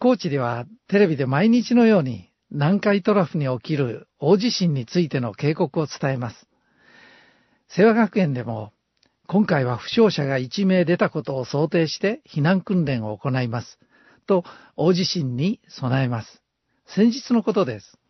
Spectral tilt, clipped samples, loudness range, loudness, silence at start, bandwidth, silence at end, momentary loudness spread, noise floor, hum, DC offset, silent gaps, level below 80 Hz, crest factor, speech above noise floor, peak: -7 dB/octave; under 0.1%; 4 LU; -21 LUFS; 0 s; 6.2 kHz; 0.3 s; 10 LU; -67 dBFS; none; under 0.1%; none; -64 dBFS; 18 dB; 46 dB; -4 dBFS